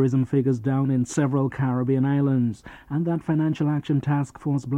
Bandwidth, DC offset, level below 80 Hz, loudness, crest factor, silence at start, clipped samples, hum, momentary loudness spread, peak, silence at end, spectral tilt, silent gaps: 9.6 kHz; under 0.1%; -56 dBFS; -24 LUFS; 14 dB; 0 s; under 0.1%; none; 6 LU; -10 dBFS; 0 s; -8 dB/octave; none